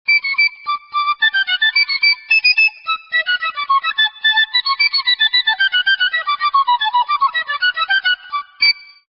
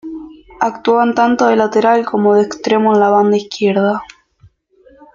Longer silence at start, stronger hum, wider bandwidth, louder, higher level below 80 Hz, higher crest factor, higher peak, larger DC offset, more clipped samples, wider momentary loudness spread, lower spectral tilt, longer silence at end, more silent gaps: about the same, 0.1 s vs 0.05 s; neither; first, 9.2 kHz vs 7.4 kHz; about the same, -14 LUFS vs -13 LUFS; second, -66 dBFS vs -56 dBFS; about the same, 14 dB vs 14 dB; about the same, -2 dBFS vs 0 dBFS; neither; neither; about the same, 6 LU vs 8 LU; second, 2 dB/octave vs -6 dB/octave; second, 0.25 s vs 1.1 s; neither